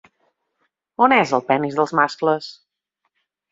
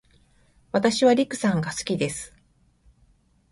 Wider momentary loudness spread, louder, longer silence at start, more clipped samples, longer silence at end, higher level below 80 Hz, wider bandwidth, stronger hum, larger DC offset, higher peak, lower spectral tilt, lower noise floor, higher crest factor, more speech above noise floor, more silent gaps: about the same, 12 LU vs 11 LU; first, -18 LUFS vs -23 LUFS; first, 1 s vs 0.75 s; neither; second, 1 s vs 1.25 s; second, -68 dBFS vs -58 dBFS; second, 7.8 kHz vs 11.5 kHz; neither; neither; first, -2 dBFS vs -6 dBFS; about the same, -5.5 dB/octave vs -5 dB/octave; first, -75 dBFS vs -62 dBFS; about the same, 20 dB vs 20 dB; first, 57 dB vs 39 dB; neither